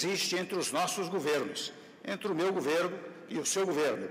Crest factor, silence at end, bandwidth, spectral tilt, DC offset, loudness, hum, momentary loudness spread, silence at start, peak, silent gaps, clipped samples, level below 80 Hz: 12 dB; 0 s; 16 kHz; -3 dB/octave; under 0.1%; -32 LUFS; none; 10 LU; 0 s; -20 dBFS; none; under 0.1%; -82 dBFS